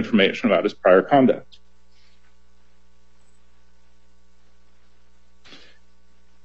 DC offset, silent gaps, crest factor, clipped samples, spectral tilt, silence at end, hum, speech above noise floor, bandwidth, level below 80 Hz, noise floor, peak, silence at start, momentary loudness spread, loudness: 0.8%; none; 22 dB; under 0.1%; -6.5 dB/octave; 5.05 s; none; 42 dB; 7.8 kHz; -62 dBFS; -60 dBFS; -2 dBFS; 0 s; 5 LU; -18 LUFS